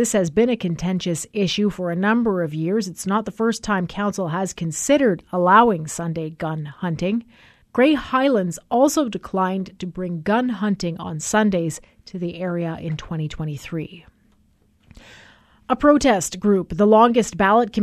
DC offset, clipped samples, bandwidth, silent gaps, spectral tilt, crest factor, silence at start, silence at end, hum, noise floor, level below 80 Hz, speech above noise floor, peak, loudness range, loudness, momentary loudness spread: under 0.1%; under 0.1%; 14 kHz; none; -5 dB/octave; 20 dB; 0 s; 0 s; none; -59 dBFS; -48 dBFS; 39 dB; 0 dBFS; 7 LU; -21 LUFS; 12 LU